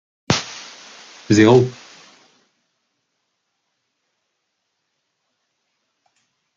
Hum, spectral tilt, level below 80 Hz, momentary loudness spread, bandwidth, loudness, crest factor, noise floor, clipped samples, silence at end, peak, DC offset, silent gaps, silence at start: none; -5.5 dB/octave; -58 dBFS; 28 LU; 7.6 kHz; -16 LUFS; 22 dB; -74 dBFS; under 0.1%; 4.85 s; 0 dBFS; under 0.1%; none; 0.3 s